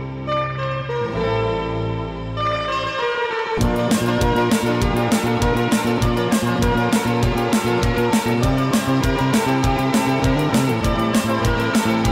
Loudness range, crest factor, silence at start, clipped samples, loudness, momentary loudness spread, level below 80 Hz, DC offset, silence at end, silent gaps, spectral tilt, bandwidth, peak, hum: 3 LU; 14 dB; 0 s; under 0.1%; -19 LUFS; 5 LU; -30 dBFS; under 0.1%; 0 s; none; -5.5 dB/octave; 16.5 kHz; -6 dBFS; none